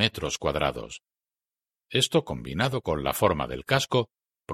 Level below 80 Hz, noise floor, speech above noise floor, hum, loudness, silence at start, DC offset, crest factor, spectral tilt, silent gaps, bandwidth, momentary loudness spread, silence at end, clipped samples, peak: -48 dBFS; under -90 dBFS; over 63 dB; none; -26 LUFS; 0 s; under 0.1%; 24 dB; -4 dB/octave; none; 16.5 kHz; 12 LU; 0 s; under 0.1%; -4 dBFS